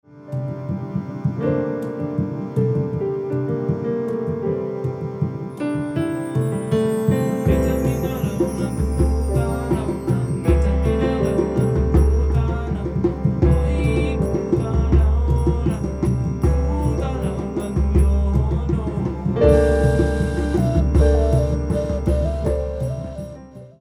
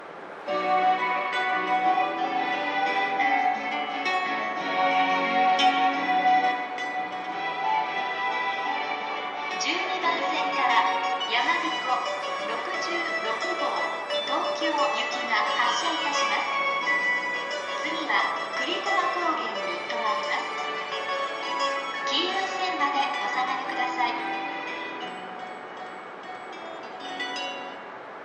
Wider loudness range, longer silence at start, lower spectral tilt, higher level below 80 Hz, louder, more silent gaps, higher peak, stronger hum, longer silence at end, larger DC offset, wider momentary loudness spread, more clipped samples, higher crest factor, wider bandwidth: about the same, 5 LU vs 5 LU; first, 0.15 s vs 0 s; first, -8.5 dB/octave vs -2 dB/octave; first, -24 dBFS vs -80 dBFS; first, -21 LUFS vs -26 LUFS; neither; first, -4 dBFS vs -8 dBFS; neither; about the same, 0.1 s vs 0 s; neither; about the same, 8 LU vs 10 LU; neither; about the same, 16 dB vs 18 dB; first, 14 kHz vs 10 kHz